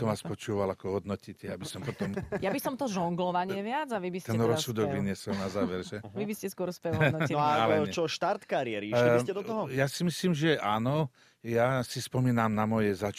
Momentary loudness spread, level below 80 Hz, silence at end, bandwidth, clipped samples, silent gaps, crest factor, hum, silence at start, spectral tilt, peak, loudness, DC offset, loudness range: 9 LU; -62 dBFS; 0 s; 15.5 kHz; under 0.1%; none; 20 dB; none; 0 s; -6 dB/octave; -10 dBFS; -30 LUFS; under 0.1%; 5 LU